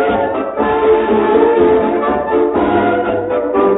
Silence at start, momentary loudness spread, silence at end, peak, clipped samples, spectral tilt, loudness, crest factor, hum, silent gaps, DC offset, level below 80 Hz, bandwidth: 0 s; 5 LU; 0 s; 0 dBFS; under 0.1%; -12 dB/octave; -13 LUFS; 12 dB; none; none; under 0.1%; -40 dBFS; 4 kHz